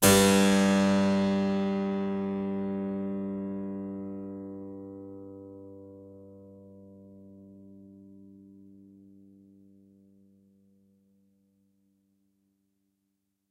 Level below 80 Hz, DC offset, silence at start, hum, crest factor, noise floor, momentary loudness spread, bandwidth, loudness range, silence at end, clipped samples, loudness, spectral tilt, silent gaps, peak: -60 dBFS; under 0.1%; 0 s; none; 24 dB; -79 dBFS; 26 LU; 16 kHz; 26 LU; 5.35 s; under 0.1%; -27 LUFS; -4.5 dB/octave; none; -6 dBFS